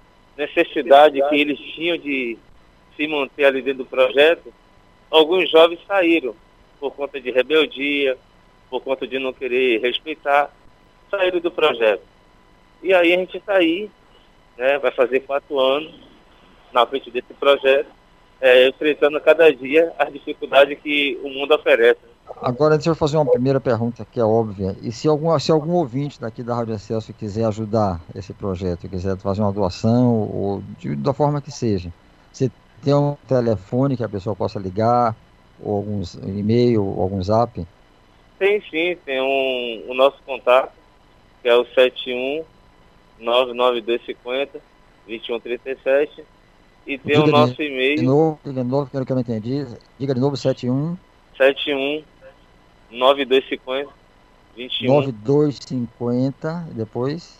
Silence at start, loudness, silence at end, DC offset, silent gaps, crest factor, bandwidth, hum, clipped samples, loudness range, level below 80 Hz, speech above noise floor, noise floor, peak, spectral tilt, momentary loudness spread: 0.4 s; -19 LUFS; 0.15 s; under 0.1%; none; 20 dB; 13.5 kHz; none; under 0.1%; 6 LU; -52 dBFS; 33 dB; -52 dBFS; 0 dBFS; -6.5 dB/octave; 13 LU